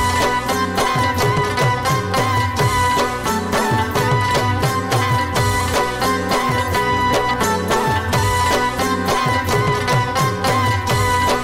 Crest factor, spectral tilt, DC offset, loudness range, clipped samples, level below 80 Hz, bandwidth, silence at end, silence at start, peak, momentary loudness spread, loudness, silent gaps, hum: 12 dB; -4.5 dB/octave; under 0.1%; 0 LU; under 0.1%; -36 dBFS; 16 kHz; 0 s; 0 s; -6 dBFS; 2 LU; -17 LUFS; none; none